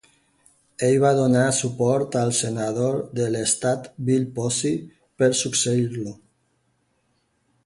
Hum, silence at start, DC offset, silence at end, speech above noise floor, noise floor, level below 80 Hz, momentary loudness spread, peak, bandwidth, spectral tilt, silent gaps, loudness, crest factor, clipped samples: none; 0.8 s; under 0.1%; 1.5 s; 47 dB; -69 dBFS; -60 dBFS; 8 LU; -6 dBFS; 11.5 kHz; -4.5 dB/octave; none; -22 LUFS; 18 dB; under 0.1%